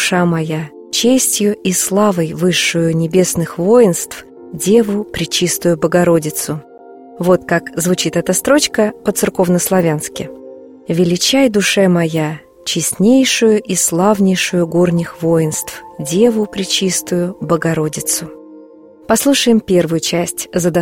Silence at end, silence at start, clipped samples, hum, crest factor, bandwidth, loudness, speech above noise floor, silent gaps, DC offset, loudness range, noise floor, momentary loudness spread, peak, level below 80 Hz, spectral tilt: 0 s; 0 s; under 0.1%; none; 14 dB; 16.5 kHz; -14 LUFS; 26 dB; none; under 0.1%; 3 LU; -39 dBFS; 9 LU; 0 dBFS; -48 dBFS; -4 dB/octave